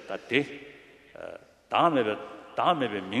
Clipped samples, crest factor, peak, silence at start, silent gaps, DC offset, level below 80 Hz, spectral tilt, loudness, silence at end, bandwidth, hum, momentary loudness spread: under 0.1%; 22 dB; -8 dBFS; 0 s; none; under 0.1%; -70 dBFS; -6 dB/octave; -27 LUFS; 0 s; 12 kHz; none; 20 LU